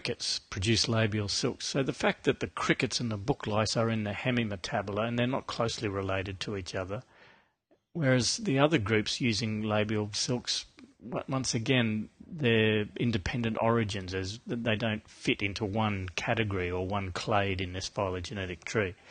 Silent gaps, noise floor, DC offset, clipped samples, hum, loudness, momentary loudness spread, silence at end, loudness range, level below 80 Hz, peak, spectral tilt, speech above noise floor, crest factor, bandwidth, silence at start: none; -71 dBFS; under 0.1%; under 0.1%; none; -30 LUFS; 9 LU; 0 s; 3 LU; -52 dBFS; -8 dBFS; -4.5 dB/octave; 40 dB; 22 dB; 9.8 kHz; 0 s